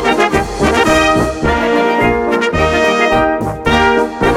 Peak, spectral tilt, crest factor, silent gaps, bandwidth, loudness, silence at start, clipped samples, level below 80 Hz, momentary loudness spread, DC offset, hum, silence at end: 0 dBFS; -5 dB/octave; 12 dB; none; 17 kHz; -12 LUFS; 0 s; under 0.1%; -28 dBFS; 4 LU; under 0.1%; none; 0 s